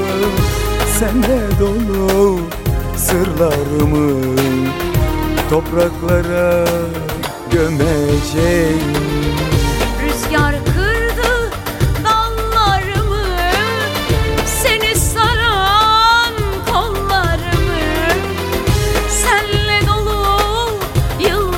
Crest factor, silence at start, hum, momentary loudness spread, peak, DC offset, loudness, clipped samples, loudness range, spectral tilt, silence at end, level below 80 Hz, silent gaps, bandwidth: 14 dB; 0 s; none; 5 LU; -2 dBFS; under 0.1%; -15 LUFS; under 0.1%; 3 LU; -4.5 dB/octave; 0 s; -22 dBFS; none; 17 kHz